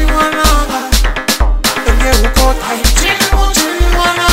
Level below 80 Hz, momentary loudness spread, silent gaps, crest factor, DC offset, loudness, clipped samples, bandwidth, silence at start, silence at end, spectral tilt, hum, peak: -12 dBFS; 3 LU; none; 10 dB; 1%; -12 LUFS; under 0.1%; 16.5 kHz; 0 s; 0 s; -3 dB/octave; none; 0 dBFS